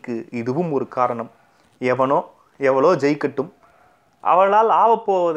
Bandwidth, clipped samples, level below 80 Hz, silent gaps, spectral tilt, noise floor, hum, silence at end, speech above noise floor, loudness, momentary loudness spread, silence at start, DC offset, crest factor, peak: 9.4 kHz; under 0.1%; -70 dBFS; none; -7 dB/octave; -56 dBFS; none; 0 s; 38 dB; -19 LUFS; 13 LU; 0.05 s; under 0.1%; 16 dB; -4 dBFS